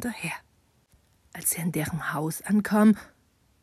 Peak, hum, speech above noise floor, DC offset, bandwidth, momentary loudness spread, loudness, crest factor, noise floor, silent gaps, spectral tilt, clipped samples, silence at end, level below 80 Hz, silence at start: -10 dBFS; none; 38 dB; under 0.1%; 14.5 kHz; 13 LU; -26 LUFS; 18 dB; -64 dBFS; none; -5 dB/octave; under 0.1%; 0.55 s; -60 dBFS; 0 s